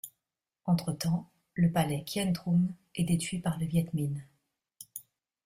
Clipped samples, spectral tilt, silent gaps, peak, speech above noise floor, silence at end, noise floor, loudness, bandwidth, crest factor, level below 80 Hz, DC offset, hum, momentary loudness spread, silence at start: under 0.1%; -6 dB/octave; none; -14 dBFS; 59 dB; 0.45 s; -88 dBFS; -31 LUFS; 16 kHz; 18 dB; -60 dBFS; under 0.1%; none; 17 LU; 0.05 s